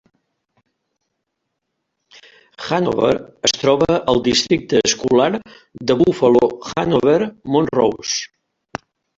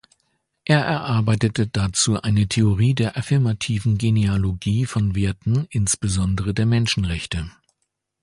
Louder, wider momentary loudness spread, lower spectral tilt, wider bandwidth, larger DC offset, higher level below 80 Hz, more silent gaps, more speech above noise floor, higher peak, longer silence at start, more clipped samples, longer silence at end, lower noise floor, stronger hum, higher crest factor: first, -17 LUFS vs -21 LUFS; first, 13 LU vs 4 LU; about the same, -4 dB/octave vs -5 dB/octave; second, 8 kHz vs 11.5 kHz; neither; second, -50 dBFS vs -38 dBFS; neither; about the same, 59 dB vs 56 dB; about the same, -2 dBFS vs -4 dBFS; first, 2.6 s vs 0.65 s; neither; first, 0.9 s vs 0.7 s; about the same, -76 dBFS vs -76 dBFS; neither; about the same, 16 dB vs 18 dB